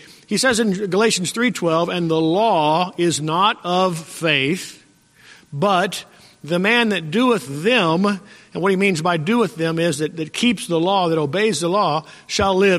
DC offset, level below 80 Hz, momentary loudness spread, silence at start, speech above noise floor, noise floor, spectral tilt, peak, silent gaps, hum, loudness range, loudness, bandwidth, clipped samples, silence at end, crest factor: under 0.1%; -54 dBFS; 8 LU; 0.3 s; 33 dB; -51 dBFS; -4.5 dB/octave; -2 dBFS; none; none; 2 LU; -19 LUFS; 14.5 kHz; under 0.1%; 0 s; 16 dB